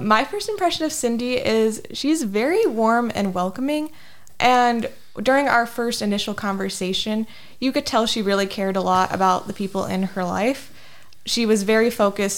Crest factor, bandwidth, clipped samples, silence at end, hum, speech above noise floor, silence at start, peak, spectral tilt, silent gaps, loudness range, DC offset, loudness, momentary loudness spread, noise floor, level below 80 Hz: 18 dB; 18 kHz; under 0.1%; 0 s; none; 28 dB; 0 s; -4 dBFS; -4 dB/octave; none; 2 LU; 0.4%; -21 LUFS; 8 LU; -49 dBFS; -52 dBFS